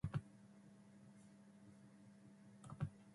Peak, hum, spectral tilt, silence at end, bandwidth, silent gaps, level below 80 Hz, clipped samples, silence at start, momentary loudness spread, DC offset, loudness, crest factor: -32 dBFS; none; -7.5 dB/octave; 0 s; 11.5 kHz; none; -70 dBFS; under 0.1%; 0.05 s; 15 LU; under 0.1%; -57 LUFS; 22 dB